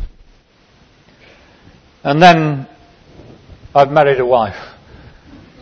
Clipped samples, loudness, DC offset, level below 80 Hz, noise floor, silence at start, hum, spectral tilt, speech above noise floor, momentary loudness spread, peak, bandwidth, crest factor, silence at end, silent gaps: 0.3%; -12 LUFS; under 0.1%; -40 dBFS; -50 dBFS; 0 s; none; -6.5 dB/octave; 39 dB; 23 LU; 0 dBFS; 8 kHz; 16 dB; 0.95 s; none